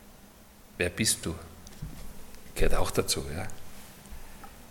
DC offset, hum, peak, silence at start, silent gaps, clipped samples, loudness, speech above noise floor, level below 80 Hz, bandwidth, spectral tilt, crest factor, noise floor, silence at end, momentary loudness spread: under 0.1%; none; -10 dBFS; 0 s; none; under 0.1%; -30 LUFS; 26 dB; -38 dBFS; 17 kHz; -3 dB/octave; 20 dB; -53 dBFS; 0.05 s; 21 LU